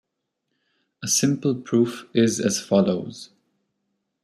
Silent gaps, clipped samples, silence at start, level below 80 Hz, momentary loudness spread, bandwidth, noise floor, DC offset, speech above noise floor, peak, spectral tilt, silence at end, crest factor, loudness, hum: none; under 0.1%; 1 s; -66 dBFS; 12 LU; 15 kHz; -78 dBFS; under 0.1%; 57 dB; -6 dBFS; -4.5 dB/octave; 1 s; 18 dB; -22 LUFS; none